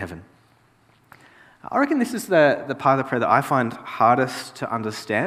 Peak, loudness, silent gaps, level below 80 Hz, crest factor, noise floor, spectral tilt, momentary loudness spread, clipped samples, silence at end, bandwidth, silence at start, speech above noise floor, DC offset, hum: -2 dBFS; -21 LUFS; none; -64 dBFS; 20 dB; -58 dBFS; -5.5 dB/octave; 11 LU; under 0.1%; 0 s; 15.5 kHz; 0 s; 37 dB; under 0.1%; none